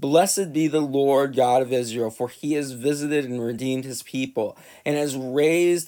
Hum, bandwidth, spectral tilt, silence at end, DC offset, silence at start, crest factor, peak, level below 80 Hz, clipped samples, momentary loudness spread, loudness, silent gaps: none; 19.5 kHz; -4.5 dB/octave; 0 s; under 0.1%; 0 s; 18 dB; -4 dBFS; -72 dBFS; under 0.1%; 10 LU; -23 LUFS; none